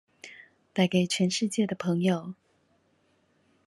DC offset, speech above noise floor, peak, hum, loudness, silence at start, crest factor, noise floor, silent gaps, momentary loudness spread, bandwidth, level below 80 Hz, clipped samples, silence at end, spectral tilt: under 0.1%; 42 dB; -8 dBFS; none; -27 LUFS; 0.25 s; 20 dB; -68 dBFS; none; 22 LU; 12 kHz; -74 dBFS; under 0.1%; 1.35 s; -5 dB/octave